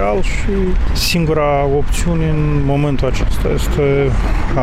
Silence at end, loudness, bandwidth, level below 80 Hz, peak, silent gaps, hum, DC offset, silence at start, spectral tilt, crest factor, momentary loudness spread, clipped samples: 0 s; -16 LUFS; 15.5 kHz; -18 dBFS; -4 dBFS; none; none; under 0.1%; 0 s; -6 dB/octave; 8 dB; 4 LU; under 0.1%